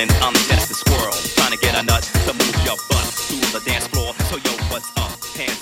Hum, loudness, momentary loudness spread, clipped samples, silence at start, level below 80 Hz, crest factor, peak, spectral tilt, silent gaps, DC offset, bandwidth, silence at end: none; -18 LUFS; 8 LU; under 0.1%; 0 s; -26 dBFS; 16 dB; -2 dBFS; -3.5 dB/octave; none; under 0.1%; 17 kHz; 0 s